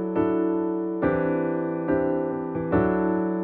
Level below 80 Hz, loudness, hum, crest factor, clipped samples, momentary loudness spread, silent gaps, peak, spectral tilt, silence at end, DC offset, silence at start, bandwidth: -48 dBFS; -25 LUFS; none; 14 dB; under 0.1%; 4 LU; none; -10 dBFS; -12 dB/octave; 0 s; under 0.1%; 0 s; 3.8 kHz